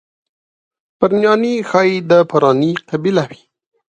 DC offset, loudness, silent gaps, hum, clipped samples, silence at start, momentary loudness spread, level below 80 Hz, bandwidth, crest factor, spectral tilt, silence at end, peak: under 0.1%; -14 LUFS; none; none; under 0.1%; 1 s; 7 LU; -60 dBFS; 8.8 kHz; 16 dB; -6.5 dB/octave; 0.6 s; 0 dBFS